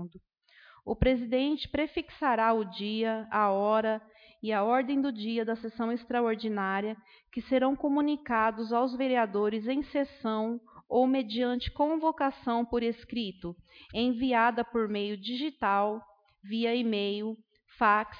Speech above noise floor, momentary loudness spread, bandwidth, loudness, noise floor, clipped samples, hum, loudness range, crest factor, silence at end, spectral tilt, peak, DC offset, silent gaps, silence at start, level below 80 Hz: 29 dB; 11 LU; 5.2 kHz; -30 LUFS; -59 dBFS; under 0.1%; none; 2 LU; 18 dB; 0 s; -8 dB/octave; -10 dBFS; under 0.1%; none; 0 s; -52 dBFS